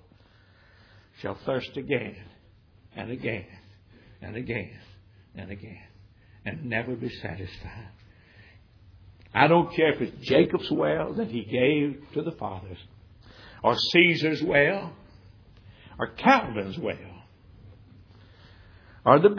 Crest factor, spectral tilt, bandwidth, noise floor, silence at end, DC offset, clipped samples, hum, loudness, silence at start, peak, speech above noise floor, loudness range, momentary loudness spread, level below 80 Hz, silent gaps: 26 dB; -6.5 dB/octave; 5.4 kHz; -57 dBFS; 0 s; under 0.1%; under 0.1%; none; -25 LUFS; 1.2 s; -2 dBFS; 32 dB; 13 LU; 21 LU; -56 dBFS; none